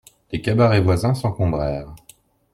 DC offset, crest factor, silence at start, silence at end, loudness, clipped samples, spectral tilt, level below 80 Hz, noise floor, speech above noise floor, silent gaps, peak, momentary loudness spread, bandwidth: under 0.1%; 16 dB; 0.3 s; 0.55 s; -20 LUFS; under 0.1%; -7.5 dB/octave; -40 dBFS; -52 dBFS; 34 dB; none; -4 dBFS; 15 LU; 14 kHz